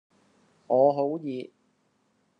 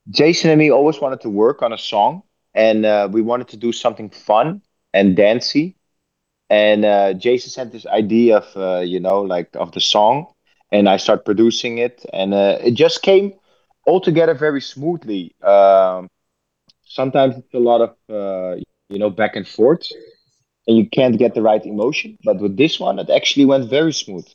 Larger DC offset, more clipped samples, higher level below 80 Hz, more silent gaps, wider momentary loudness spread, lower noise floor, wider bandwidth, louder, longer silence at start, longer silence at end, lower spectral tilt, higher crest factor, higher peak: neither; neither; second, -82 dBFS vs -68 dBFS; neither; first, 16 LU vs 11 LU; second, -70 dBFS vs -75 dBFS; second, 5.4 kHz vs 7.6 kHz; second, -25 LUFS vs -16 LUFS; first, 0.7 s vs 0.05 s; first, 0.95 s vs 0.15 s; first, -9 dB/octave vs -5.5 dB/octave; about the same, 20 dB vs 16 dB; second, -10 dBFS vs 0 dBFS